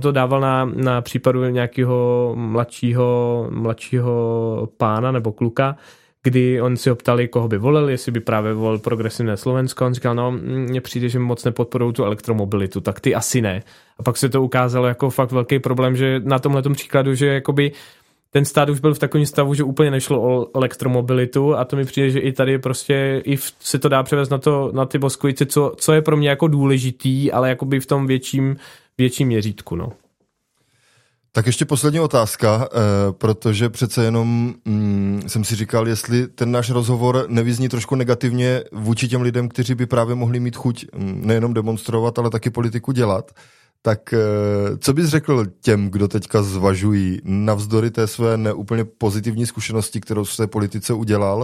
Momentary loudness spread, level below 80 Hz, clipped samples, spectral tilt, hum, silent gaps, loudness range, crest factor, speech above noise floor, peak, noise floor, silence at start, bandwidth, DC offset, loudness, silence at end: 5 LU; -54 dBFS; under 0.1%; -6 dB/octave; none; none; 3 LU; 18 dB; 50 dB; -2 dBFS; -68 dBFS; 0 s; 16 kHz; under 0.1%; -19 LUFS; 0 s